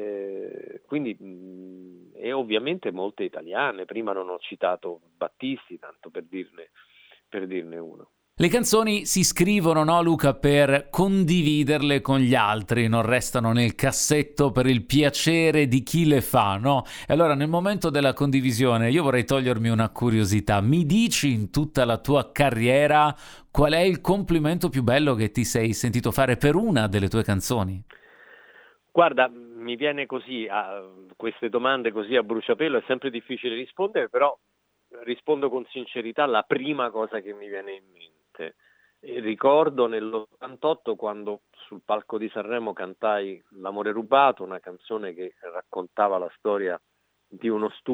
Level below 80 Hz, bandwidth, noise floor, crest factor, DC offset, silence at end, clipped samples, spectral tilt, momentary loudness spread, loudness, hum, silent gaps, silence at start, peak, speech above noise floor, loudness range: -46 dBFS; over 20 kHz; -56 dBFS; 20 dB; under 0.1%; 0 s; under 0.1%; -5 dB/octave; 16 LU; -23 LUFS; none; none; 0 s; -4 dBFS; 33 dB; 9 LU